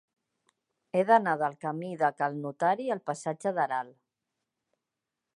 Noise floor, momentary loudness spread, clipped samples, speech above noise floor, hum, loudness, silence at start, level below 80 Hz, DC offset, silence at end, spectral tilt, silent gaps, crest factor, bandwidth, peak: -87 dBFS; 11 LU; under 0.1%; 59 dB; none; -29 LUFS; 0.95 s; -86 dBFS; under 0.1%; 1.45 s; -6 dB/octave; none; 22 dB; 11.5 kHz; -10 dBFS